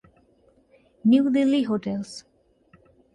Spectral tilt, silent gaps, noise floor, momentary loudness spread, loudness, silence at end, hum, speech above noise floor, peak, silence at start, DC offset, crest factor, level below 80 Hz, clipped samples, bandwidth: -6.5 dB/octave; none; -61 dBFS; 17 LU; -22 LUFS; 0.95 s; none; 39 dB; -8 dBFS; 1.05 s; under 0.1%; 18 dB; -64 dBFS; under 0.1%; 11 kHz